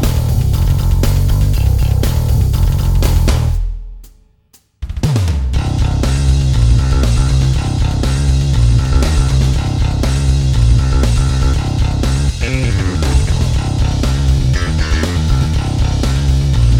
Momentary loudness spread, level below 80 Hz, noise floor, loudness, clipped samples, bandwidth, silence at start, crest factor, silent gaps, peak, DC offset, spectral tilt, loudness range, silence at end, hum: 4 LU; -14 dBFS; -51 dBFS; -14 LUFS; under 0.1%; 18 kHz; 0 s; 12 dB; none; 0 dBFS; under 0.1%; -6 dB/octave; 3 LU; 0 s; none